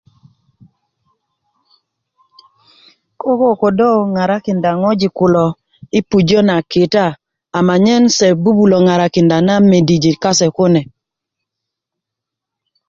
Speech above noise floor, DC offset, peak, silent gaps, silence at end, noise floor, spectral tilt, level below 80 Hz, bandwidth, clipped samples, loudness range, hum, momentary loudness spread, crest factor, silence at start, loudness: 70 dB; under 0.1%; 0 dBFS; none; 2.05 s; -82 dBFS; -5.5 dB/octave; -50 dBFS; 7.8 kHz; under 0.1%; 6 LU; none; 7 LU; 14 dB; 3.25 s; -12 LUFS